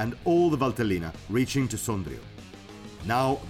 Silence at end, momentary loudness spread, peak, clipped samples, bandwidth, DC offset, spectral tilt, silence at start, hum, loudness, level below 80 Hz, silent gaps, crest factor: 0 s; 21 LU; -12 dBFS; under 0.1%; 16.5 kHz; under 0.1%; -6 dB/octave; 0 s; none; -27 LUFS; -48 dBFS; none; 14 dB